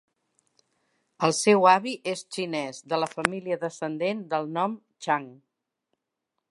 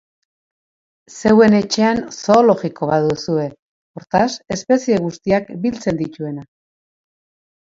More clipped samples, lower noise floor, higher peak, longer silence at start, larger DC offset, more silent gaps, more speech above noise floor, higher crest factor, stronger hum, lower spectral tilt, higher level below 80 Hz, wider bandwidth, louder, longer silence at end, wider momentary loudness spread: neither; second, -83 dBFS vs under -90 dBFS; about the same, 0 dBFS vs 0 dBFS; about the same, 1.2 s vs 1.1 s; neither; second, none vs 3.59-3.94 s; second, 57 dB vs over 74 dB; first, 28 dB vs 18 dB; neither; second, -4 dB/octave vs -5.5 dB/octave; second, -74 dBFS vs -52 dBFS; first, 11.5 kHz vs 7.8 kHz; second, -26 LUFS vs -17 LUFS; about the same, 1.2 s vs 1.3 s; about the same, 12 LU vs 13 LU